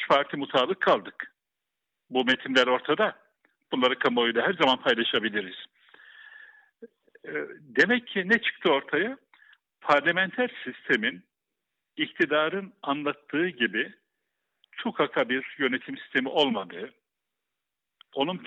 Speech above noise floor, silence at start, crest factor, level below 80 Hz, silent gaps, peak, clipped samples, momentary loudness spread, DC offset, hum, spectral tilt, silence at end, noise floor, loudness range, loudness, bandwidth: 60 dB; 0 s; 20 dB; -76 dBFS; none; -8 dBFS; under 0.1%; 14 LU; under 0.1%; none; -5 dB/octave; 0 s; -86 dBFS; 4 LU; -26 LUFS; 8.2 kHz